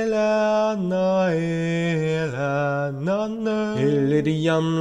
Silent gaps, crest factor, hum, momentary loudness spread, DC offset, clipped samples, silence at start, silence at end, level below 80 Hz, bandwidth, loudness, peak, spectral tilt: none; 12 dB; none; 4 LU; under 0.1%; under 0.1%; 0 s; 0 s; -56 dBFS; 10 kHz; -22 LUFS; -8 dBFS; -7 dB/octave